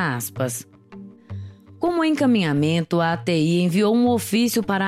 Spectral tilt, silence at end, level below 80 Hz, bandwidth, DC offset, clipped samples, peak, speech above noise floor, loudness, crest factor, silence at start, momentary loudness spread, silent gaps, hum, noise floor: -5.5 dB/octave; 0 s; -60 dBFS; 16 kHz; under 0.1%; under 0.1%; -8 dBFS; 22 dB; -20 LUFS; 14 dB; 0 s; 18 LU; none; none; -42 dBFS